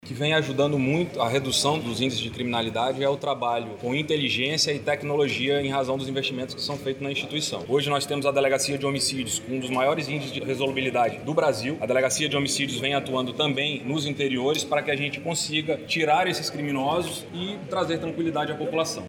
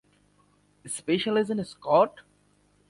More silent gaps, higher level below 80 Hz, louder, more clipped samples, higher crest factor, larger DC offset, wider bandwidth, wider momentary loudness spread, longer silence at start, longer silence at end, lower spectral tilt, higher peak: neither; first, -60 dBFS vs -68 dBFS; about the same, -25 LUFS vs -26 LUFS; neither; about the same, 18 dB vs 20 dB; neither; first, 19 kHz vs 11.5 kHz; second, 6 LU vs 11 LU; second, 0.05 s vs 0.85 s; second, 0 s vs 0.7 s; about the same, -4 dB/octave vs -4.5 dB/octave; about the same, -8 dBFS vs -8 dBFS